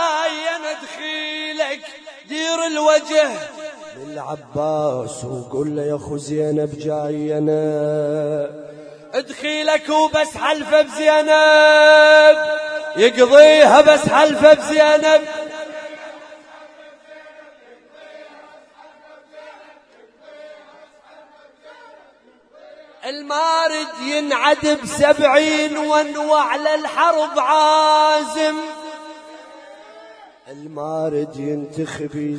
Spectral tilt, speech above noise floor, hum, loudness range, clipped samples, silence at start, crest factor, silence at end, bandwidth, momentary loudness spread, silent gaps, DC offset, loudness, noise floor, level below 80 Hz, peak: -3.5 dB/octave; 37 dB; none; 14 LU; under 0.1%; 0 s; 18 dB; 0 s; 10.5 kHz; 20 LU; none; under 0.1%; -15 LUFS; -52 dBFS; -58 dBFS; 0 dBFS